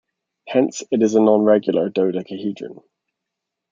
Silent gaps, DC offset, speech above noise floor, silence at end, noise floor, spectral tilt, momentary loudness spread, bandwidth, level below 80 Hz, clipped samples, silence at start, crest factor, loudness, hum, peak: none; under 0.1%; 64 dB; 1 s; -82 dBFS; -6 dB/octave; 13 LU; 7.6 kHz; -70 dBFS; under 0.1%; 0.45 s; 18 dB; -18 LUFS; none; -2 dBFS